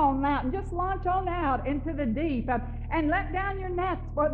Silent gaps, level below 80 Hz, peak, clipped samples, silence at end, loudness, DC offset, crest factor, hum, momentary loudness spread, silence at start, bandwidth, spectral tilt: none; -36 dBFS; -12 dBFS; under 0.1%; 0 s; -29 LUFS; under 0.1%; 14 dB; none; 4 LU; 0 s; 7 kHz; -6 dB/octave